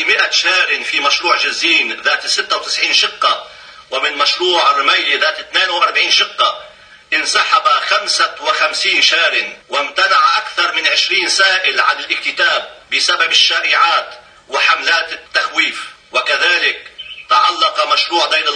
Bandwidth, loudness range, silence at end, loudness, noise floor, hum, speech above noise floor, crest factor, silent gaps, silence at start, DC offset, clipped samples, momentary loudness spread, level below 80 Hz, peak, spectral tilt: 10 kHz; 2 LU; 0 s; -12 LUFS; -34 dBFS; none; 20 dB; 14 dB; none; 0 s; under 0.1%; under 0.1%; 7 LU; -62 dBFS; 0 dBFS; 1.5 dB/octave